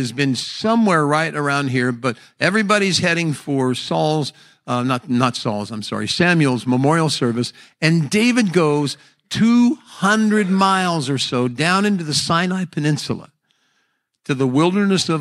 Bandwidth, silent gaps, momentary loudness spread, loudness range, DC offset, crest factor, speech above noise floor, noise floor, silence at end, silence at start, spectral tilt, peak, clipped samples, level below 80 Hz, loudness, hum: 13.5 kHz; none; 9 LU; 3 LU; under 0.1%; 18 dB; 50 dB; -68 dBFS; 0 s; 0 s; -5 dB/octave; 0 dBFS; under 0.1%; -60 dBFS; -18 LUFS; none